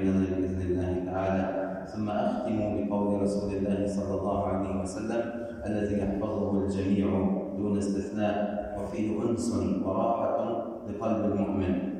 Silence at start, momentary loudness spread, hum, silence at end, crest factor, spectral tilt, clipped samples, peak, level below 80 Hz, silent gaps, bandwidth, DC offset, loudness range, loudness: 0 s; 5 LU; none; 0 s; 14 dB; -7.5 dB/octave; under 0.1%; -16 dBFS; -52 dBFS; none; 10.5 kHz; under 0.1%; 1 LU; -30 LUFS